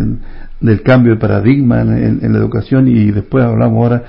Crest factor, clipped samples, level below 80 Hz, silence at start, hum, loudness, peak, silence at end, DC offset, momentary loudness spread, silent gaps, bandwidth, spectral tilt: 10 dB; under 0.1%; -30 dBFS; 0 s; none; -11 LUFS; 0 dBFS; 0 s; under 0.1%; 5 LU; none; 5.6 kHz; -11.5 dB/octave